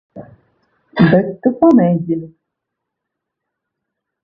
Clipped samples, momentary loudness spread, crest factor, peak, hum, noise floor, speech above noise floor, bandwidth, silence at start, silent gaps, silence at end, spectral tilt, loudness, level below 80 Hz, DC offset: under 0.1%; 12 LU; 18 dB; 0 dBFS; none; -79 dBFS; 66 dB; 5.2 kHz; 0.15 s; none; 1.95 s; -10 dB/octave; -14 LUFS; -52 dBFS; under 0.1%